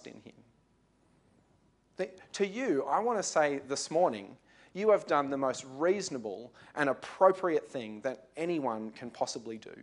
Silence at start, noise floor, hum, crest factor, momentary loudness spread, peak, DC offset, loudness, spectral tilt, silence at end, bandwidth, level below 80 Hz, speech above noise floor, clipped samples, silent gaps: 0.05 s; -69 dBFS; none; 22 dB; 16 LU; -10 dBFS; under 0.1%; -32 LUFS; -4 dB/octave; 0 s; 11 kHz; -78 dBFS; 37 dB; under 0.1%; none